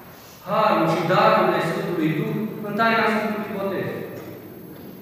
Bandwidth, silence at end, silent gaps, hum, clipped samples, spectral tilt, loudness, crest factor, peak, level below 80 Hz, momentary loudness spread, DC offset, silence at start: 15 kHz; 0 s; none; none; under 0.1%; -6.5 dB/octave; -21 LUFS; 18 dB; -4 dBFS; -64 dBFS; 21 LU; under 0.1%; 0 s